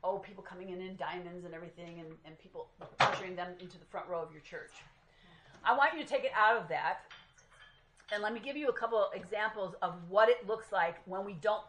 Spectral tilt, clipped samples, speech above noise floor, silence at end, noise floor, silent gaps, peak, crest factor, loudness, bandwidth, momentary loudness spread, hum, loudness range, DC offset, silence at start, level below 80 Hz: -4.5 dB/octave; under 0.1%; 27 dB; 0 s; -62 dBFS; none; -14 dBFS; 22 dB; -34 LUFS; 10.5 kHz; 21 LU; none; 5 LU; under 0.1%; 0.05 s; -70 dBFS